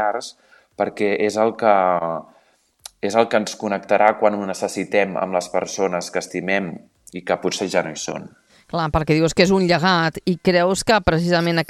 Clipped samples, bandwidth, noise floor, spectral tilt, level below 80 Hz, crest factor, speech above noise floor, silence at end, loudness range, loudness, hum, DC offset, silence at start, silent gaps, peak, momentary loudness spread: under 0.1%; 13.5 kHz; -58 dBFS; -5 dB/octave; -44 dBFS; 20 dB; 39 dB; 0.05 s; 5 LU; -20 LUFS; none; under 0.1%; 0 s; none; 0 dBFS; 12 LU